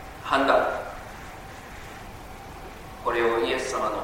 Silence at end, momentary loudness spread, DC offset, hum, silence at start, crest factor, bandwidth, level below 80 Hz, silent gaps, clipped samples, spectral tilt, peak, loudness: 0 s; 19 LU; under 0.1%; none; 0 s; 22 dB; 16.5 kHz; -48 dBFS; none; under 0.1%; -4 dB/octave; -6 dBFS; -25 LUFS